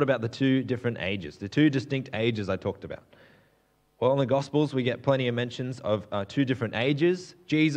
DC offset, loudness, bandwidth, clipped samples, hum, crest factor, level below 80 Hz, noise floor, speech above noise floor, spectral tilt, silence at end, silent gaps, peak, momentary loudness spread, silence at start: under 0.1%; -27 LUFS; 9.2 kHz; under 0.1%; none; 18 dB; -66 dBFS; -67 dBFS; 40 dB; -7 dB/octave; 0 s; none; -10 dBFS; 9 LU; 0 s